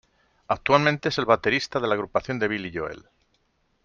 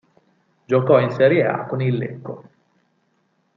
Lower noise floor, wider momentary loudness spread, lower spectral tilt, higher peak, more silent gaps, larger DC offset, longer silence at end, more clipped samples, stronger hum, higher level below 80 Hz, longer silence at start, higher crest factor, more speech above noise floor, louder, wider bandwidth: about the same, -69 dBFS vs -66 dBFS; second, 12 LU vs 19 LU; second, -5.5 dB/octave vs -9 dB/octave; about the same, -4 dBFS vs -2 dBFS; neither; neither; second, 0.85 s vs 1.2 s; neither; neither; first, -56 dBFS vs -66 dBFS; second, 0.5 s vs 0.7 s; about the same, 22 dB vs 18 dB; about the same, 45 dB vs 48 dB; second, -24 LUFS vs -19 LUFS; first, 7.4 kHz vs 6.2 kHz